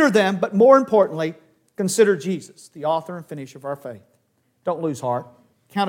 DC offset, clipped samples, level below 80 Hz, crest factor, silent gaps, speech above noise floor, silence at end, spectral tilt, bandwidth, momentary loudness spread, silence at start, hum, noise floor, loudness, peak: under 0.1%; under 0.1%; -72 dBFS; 20 dB; none; 46 dB; 0 s; -5 dB/octave; 16.5 kHz; 19 LU; 0 s; none; -66 dBFS; -20 LUFS; 0 dBFS